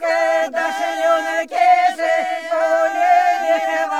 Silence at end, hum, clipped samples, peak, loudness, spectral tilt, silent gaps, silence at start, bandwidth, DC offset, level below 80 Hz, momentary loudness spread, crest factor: 0 s; none; under 0.1%; -4 dBFS; -17 LUFS; -0.5 dB/octave; none; 0 s; 13.5 kHz; 0.2%; -74 dBFS; 6 LU; 12 dB